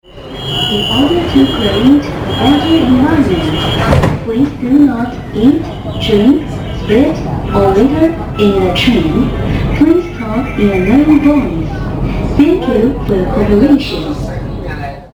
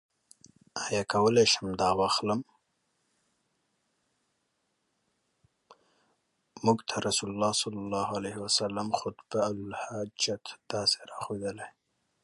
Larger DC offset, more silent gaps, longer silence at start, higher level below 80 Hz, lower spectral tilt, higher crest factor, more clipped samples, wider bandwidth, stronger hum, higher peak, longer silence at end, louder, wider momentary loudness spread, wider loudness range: neither; neither; second, 0.1 s vs 0.75 s; first, -24 dBFS vs -64 dBFS; first, -7 dB/octave vs -3.5 dB/octave; second, 10 dB vs 22 dB; neither; first, 16 kHz vs 11.5 kHz; neither; first, 0 dBFS vs -10 dBFS; second, 0.05 s vs 0.55 s; first, -11 LUFS vs -29 LUFS; second, 9 LU vs 12 LU; second, 2 LU vs 7 LU